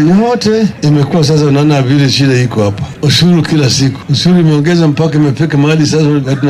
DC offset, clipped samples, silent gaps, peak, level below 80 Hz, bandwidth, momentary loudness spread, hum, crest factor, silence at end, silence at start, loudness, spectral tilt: under 0.1%; under 0.1%; none; -2 dBFS; -42 dBFS; 13 kHz; 4 LU; none; 8 dB; 0 s; 0 s; -9 LUFS; -6 dB/octave